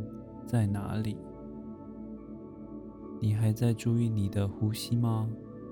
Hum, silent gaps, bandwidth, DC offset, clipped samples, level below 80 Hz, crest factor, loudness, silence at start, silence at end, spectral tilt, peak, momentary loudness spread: none; none; 18 kHz; under 0.1%; under 0.1%; -58 dBFS; 18 dB; -31 LUFS; 0 s; 0 s; -7.5 dB/octave; -14 dBFS; 16 LU